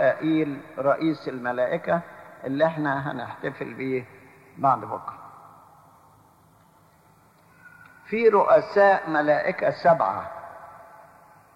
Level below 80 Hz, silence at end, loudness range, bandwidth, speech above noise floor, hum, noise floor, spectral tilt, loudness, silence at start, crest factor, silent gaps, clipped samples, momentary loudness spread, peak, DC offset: -68 dBFS; 0.75 s; 10 LU; 11 kHz; 34 dB; none; -57 dBFS; -7.5 dB/octave; -24 LUFS; 0 s; 18 dB; none; under 0.1%; 19 LU; -6 dBFS; under 0.1%